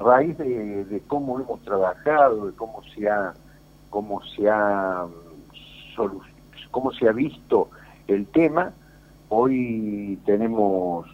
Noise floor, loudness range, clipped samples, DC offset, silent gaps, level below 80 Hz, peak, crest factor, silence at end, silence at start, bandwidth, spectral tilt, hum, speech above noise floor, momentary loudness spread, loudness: -50 dBFS; 4 LU; under 0.1%; under 0.1%; none; -54 dBFS; -4 dBFS; 20 dB; 0.05 s; 0 s; 16 kHz; -8 dB/octave; none; 28 dB; 13 LU; -23 LUFS